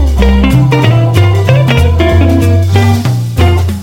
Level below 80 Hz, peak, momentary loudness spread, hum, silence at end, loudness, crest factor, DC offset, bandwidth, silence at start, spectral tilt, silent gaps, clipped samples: -16 dBFS; 0 dBFS; 2 LU; none; 0 s; -8 LUFS; 8 dB; under 0.1%; 16.5 kHz; 0 s; -7 dB/octave; none; 2%